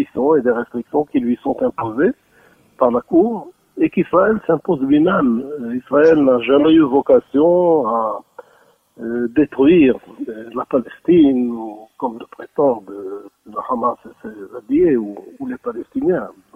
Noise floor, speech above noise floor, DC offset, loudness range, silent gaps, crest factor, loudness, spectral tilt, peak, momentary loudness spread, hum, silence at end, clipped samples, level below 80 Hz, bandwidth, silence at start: -54 dBFS; 38 dB; under 0.1%; 7 LU; none; 16 dB; -16 LUFS; -9 dB/octave; 0 dBFS; 18 LU; none; 0.25 s; under 0.1%; -52 dBFS; 5.8 kHz; 0 s